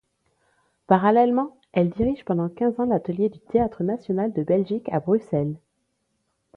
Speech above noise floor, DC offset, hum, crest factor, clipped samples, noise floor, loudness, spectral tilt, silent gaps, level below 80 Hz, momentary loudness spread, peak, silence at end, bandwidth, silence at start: 51 dB; under 0.1%; none; 20 dB; under 0.1%; -73 dBFS; -23 LUFS; -10 dB/octave; none; -52 dBFS; 8 LU; -4 dBFS; 1 s; 4.8 kHz; 0.9 s